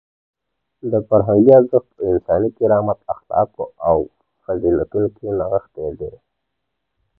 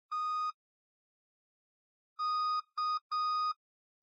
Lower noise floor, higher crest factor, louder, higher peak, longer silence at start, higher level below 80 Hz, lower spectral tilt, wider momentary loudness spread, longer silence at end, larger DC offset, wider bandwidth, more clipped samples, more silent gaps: second, -77 dBFS vs under -90 dBFS; first, 18 dB vs 10 dB; first, -18 LUFS vs -34 LUFS; first, 0 dBFS vs -28 dBFS; first, 0.85 s vs 0.1 s; first, -44 dBFS vs under -90 dBFS; first, -13 dB/octave vs 7 dB/octave; first, 15 LU vs 6 LU; first, 1.1 s vs 0.5 s; neither; second, 2.3 kHz vs 7.8 kHz; neither; second, none vs 0.54-2.16 s, 3.01-3.10 s